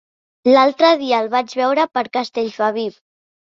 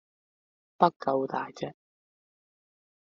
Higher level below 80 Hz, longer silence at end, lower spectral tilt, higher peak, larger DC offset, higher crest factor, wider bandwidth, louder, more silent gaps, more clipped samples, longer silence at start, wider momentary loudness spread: first, -70 dBFS vs -78 dBFS; second, 0.7 s vs 1.4 s; about the same, -4 dB/octave vs -5 dB/octave; first, -2 dBFS vs -6 dBFS; neither; second, 16 dB vs 28 dB; about the same, 7.6 kHz vs 7.2 kHz; first, -17 LUFS vs -28 LUFS; second, none vs 0.96-1.00 s; neither; second, 0.45 s vs 0.8 s; second, 9 LU vs 14 LU